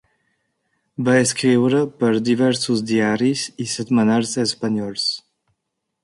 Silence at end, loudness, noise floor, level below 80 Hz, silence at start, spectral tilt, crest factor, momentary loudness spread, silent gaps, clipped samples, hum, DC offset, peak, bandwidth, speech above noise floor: 0.85 s; -19 LUFS; -77 dBFS; -62 dBFS; 1 s; -4.5 dB/octave; 16 dB; 8 LU; none; under 0.1%; none; under 0.1%; -4 dBFS; 11.5 kHz; 59 dB